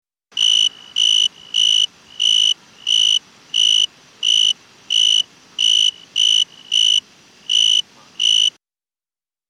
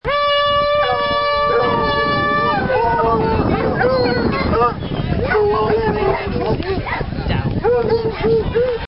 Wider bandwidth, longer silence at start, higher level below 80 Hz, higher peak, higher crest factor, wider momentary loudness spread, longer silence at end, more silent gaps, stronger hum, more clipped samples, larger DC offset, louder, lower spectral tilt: first, 13 kHz vs 5.8 kHz; first, 0.35 s vs 0.05 s; second, -72 dBFS vs -32 dBFS; about the same, -4 dBFS vs -4 dBFS; about the same, 14 dB vs 14 dB; about the same, 7 LU vs 5 LU; first, 1 s vs 0 s; neither; neither; neither; second, under 0.1% vs 0.8%; first, -14 LUFS vs -17 LUFS; second, 4 dB/octave vs -9.5 dB/octave